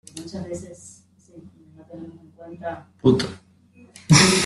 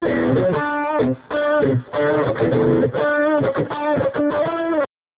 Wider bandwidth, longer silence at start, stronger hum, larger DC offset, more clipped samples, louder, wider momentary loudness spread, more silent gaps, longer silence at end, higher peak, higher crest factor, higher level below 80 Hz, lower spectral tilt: first, 12.5 kHz vs 4 kHz; first, 0.15 s vs 0 s; neither; neither; neither; about the same, -21 LUFS vs -19 LUFS; first, 27 LU vs 4 LU; neither; second, 0 s vs 0.3 s; first, -2 dBFS vs -6 dBFS; first, 22 dB vs 12 dB; about the same, -52 dBFS vs -48 dBFS; second, -4 dB/octave vs -11 dB/octave